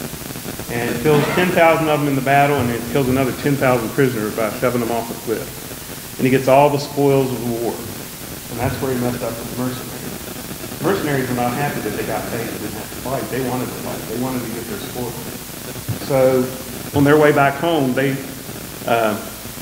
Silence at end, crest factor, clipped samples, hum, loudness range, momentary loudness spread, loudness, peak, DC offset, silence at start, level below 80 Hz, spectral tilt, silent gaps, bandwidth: 0 s; 18 dB; under 0.1%; none; 7 LU; 15 LU; -19 LUFS; 0 dBFS; under 0.1%; 0 s; -44 dBFS; -5.5 dB/octave; none; 16 kHz